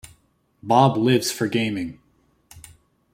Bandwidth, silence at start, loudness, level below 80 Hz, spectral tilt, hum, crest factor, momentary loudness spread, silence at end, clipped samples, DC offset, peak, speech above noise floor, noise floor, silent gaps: 16.5 kHz; 0.05 s; -20 LUFS; -58 dBFS; -5.5 dB/octave; none; 20 dB; 15 LU; 0.55 s; under 0.1%; under 0.1%; -2 dBFS; 43 dB; -63 dBFS; none